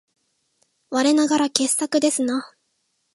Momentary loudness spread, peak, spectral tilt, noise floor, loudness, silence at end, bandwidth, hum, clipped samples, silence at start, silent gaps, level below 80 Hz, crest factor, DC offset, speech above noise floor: 8 LU; 0 dBFS; -1.5 dB/octave; -71 dBFS; -20 LUFS; 0.7 s; 12 kHz; none; under 0.1%; 0.9 s; none; -74 dBFS; 22 dB; under 0.1%; 51 dB